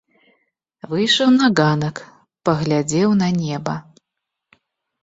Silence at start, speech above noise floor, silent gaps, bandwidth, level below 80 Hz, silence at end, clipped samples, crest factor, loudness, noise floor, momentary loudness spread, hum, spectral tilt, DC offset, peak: 0.85 s; 64 dB; none; 8 kHz; -56 dBFS; 1.2 s; under 0.1%; 18 dB; -18 LUFS; -81 dBFS; 13 LU; none; -5 dB/octave; under 0.1%; -2 dBFS